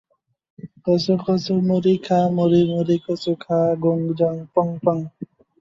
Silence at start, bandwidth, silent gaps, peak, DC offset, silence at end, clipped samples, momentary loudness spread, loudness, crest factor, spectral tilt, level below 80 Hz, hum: 0.65 s; 7.6 kHz; none; -4 dBFS; under 0.1%; 0.35 s; under 0.1%; 8 LU; -20 LUFS; 16 dB; -8 dB/octave; -60 dBFS; none